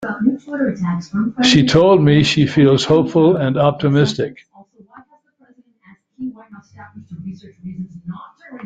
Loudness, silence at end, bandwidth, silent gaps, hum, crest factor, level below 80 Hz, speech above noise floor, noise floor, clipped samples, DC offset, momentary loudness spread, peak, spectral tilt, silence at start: -15 LUFS; 0 s; 9 kHz; none; none; 16 dB; -48 dBFS; 39 dB; -54 dBFS; under 0.1%; under 0.1%; 22 LU; 0 dBFS; -6 dB/octave; 0 s